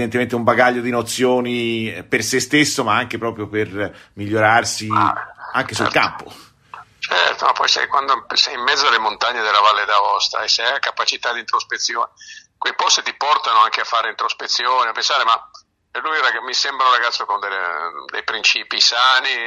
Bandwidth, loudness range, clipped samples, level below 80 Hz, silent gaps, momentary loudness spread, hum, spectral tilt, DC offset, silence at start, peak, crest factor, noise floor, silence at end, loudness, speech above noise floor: 15 kHz; 3 LU; under 0.1%; -60 dBFS; none; 9 LU; none; -2 dB/octave; under 0.1%; 0 s; 0 dBFS; 18 dB; -41 dBFS; 0 s; -17 LUFS; 23 dB